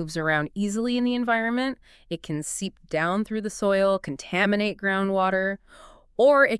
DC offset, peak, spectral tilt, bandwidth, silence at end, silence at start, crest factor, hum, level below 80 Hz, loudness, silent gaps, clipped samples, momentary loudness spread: under 0.1%; -8 dBFS; -5 dB/octave; 12 kHz; 0 s; 0 s; 18 dB; none; -56 dBFS; -24 LUFS; none; under 0.1%; 10 LU